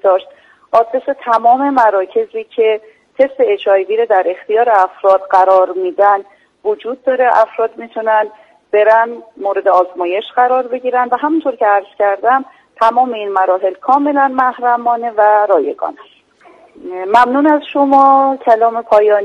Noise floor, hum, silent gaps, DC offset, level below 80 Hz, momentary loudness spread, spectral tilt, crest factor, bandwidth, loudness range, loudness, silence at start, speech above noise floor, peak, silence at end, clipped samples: -45 dBFS; none; none; under 0.1%; -62 dBFS; 9 LU; -5 dB/octave; 12 dB; 8.4 kHz; 2 LU; -13 LUFS; 0.05 s; 33 dB; 0 dBFS; 0 s; under 0.1%